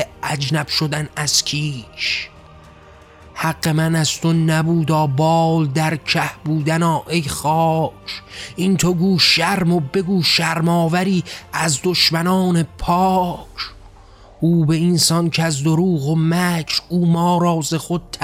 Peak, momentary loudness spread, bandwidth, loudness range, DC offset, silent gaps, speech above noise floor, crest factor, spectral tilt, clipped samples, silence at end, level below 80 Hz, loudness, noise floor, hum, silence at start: -4 dBFS; 9 LU; 16 kHz; 4 LU; under 0.1%; none; 26 dB; 14 dB; -4.5 dB/octave; under 0.1%; 0 s; -46 dBFS; -17 LUFS; -44 dBFS; none; 0 s